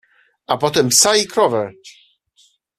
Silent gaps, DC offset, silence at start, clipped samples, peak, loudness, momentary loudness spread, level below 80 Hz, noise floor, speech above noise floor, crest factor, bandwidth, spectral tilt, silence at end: none; under 0.1%; 0.5 s; under 0.1%; 0 dBFS; -15 LUFS; 12 LU; -58 dBFS; -57 dBFS; 41 dB; 18 dB; 15.5 kHz; -2 dB/octave; 0.9 s